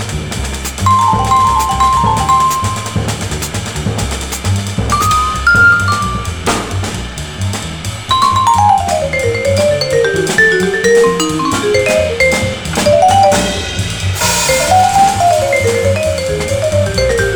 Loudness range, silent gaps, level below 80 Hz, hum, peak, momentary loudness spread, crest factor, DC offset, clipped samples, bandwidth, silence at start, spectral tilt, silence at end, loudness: 3 LU; none; -28 dBFS; none; 0 dBFS; 10 LU; 12 dB; under 0.1%; under 0.1%; over 20 kHz; 0 s; -4 dB/octave; 0 s; -12 LUFS